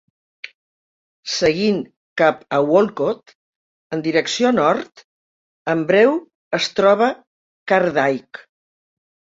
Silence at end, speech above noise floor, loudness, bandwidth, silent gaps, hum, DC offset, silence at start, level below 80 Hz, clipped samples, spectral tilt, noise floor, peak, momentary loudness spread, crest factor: 1.2 s; over 73 dB; -18 LUFS; 7.8 kHz; 1.97-2.16 s, 3.35-3.90 s, 5.04-5.65 s, 6.35-6.51 s, 7.27-7.66 s; none; under 0.1%; 1.25 s; -62 dBFS; under 0.1%; -4.5 dB/octave; under -90 dBFS; -2 dBFS; 21 LU; 18 dB